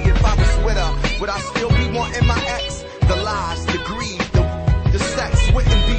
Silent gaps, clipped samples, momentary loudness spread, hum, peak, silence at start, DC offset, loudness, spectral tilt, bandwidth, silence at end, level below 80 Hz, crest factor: none; under 0.1%; 6 LU; none; -4 dBFS; 0 s; under 0.1%; -19 LUFS; -5 dB/octave; 8.8 kHz; 0 s; -20 dBFS; 12 dB